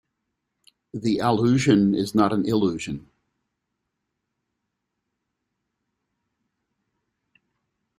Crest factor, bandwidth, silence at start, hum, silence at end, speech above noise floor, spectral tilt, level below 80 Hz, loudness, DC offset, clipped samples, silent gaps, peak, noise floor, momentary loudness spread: 22 dB; 15.5 kHz; 0.95 s; none; 5 s; 59 dB; -6.5 dB/octave; -60 dBFS; -21 LUFS; under 0.1%; under 0.1%; none; -4 dBFS; -80 dBFS; 14 LU